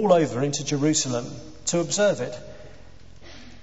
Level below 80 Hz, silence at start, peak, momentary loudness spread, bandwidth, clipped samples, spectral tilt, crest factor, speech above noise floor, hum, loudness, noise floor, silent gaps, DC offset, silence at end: -54 dBFS; 0 s; -6 dBFS; 21 LU; 8.2 kHz; under 0.1%; -4 dB/octave; 20 dB; 25 dB; none; -24 LUFS; -48 dBFS; none; 0.7%; 0.05 s